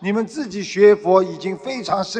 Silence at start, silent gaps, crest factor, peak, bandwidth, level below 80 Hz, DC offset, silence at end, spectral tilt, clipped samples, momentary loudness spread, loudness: 0 s; none; 18 dB; 0 dBFS; 9.2 kHz; -60 dBFS; under 0.1%; 0 s; -5.5 dB/octave; under 0.1%; 13 LU; -18 LUFS